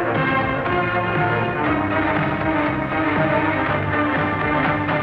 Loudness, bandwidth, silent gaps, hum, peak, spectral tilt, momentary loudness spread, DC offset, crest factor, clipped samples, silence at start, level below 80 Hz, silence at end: -20 LUFS; 5.6 kHz; none; none; -8 dBFS; -8.5 dB/octave; 2 LU; under 0.1%; 12 dB; under 0.1%; 0 s; -42 dBFS; 0 s